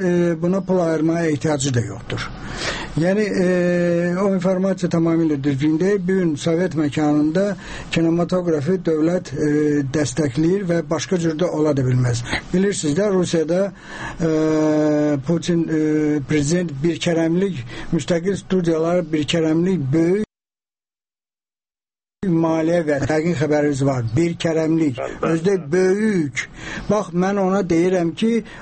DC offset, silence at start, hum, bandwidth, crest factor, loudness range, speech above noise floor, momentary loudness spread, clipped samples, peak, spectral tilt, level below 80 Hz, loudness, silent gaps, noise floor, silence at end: under 0.1%; 0 s; none; 8.8 kHz; 12 dB; 2 LU; over 71 dB; 6 LU; under 0.1%; -6 dBFS; -6.5 dB/octave; -44 dBFS; -19 LUFS; none; under -90 dBFS; 0 s